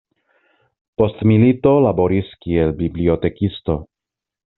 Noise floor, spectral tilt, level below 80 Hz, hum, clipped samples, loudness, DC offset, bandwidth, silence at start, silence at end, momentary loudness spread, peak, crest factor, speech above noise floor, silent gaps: -86 dBFS; -8 dB/octave; -42 dBFS; none; under 0.1%; -17 LUFS; under 0.1%; 4.1 kHz; 1 s; 0.75 s; 10 LU; -2 dBFS; 16 dB; 70 dB; none